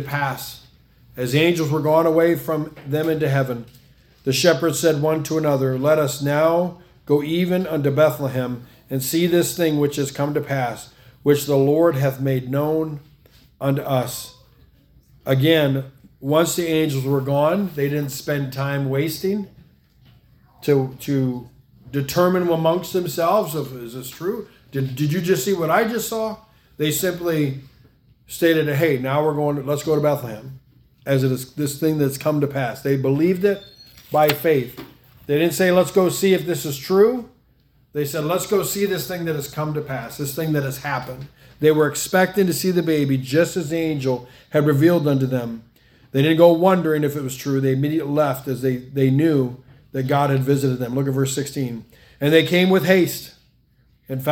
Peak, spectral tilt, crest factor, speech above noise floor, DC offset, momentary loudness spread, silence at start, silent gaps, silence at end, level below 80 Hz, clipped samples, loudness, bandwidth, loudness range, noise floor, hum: 0 dBFS; -5.5 dB/octave; 20 dB; 39 dB; under 0.1%; 12 LU; 0 s; none; 0 s; -56 dBFS; under 0.1%; -20 LUFS; 18 kHz; 4 LU; -58 dBFS; none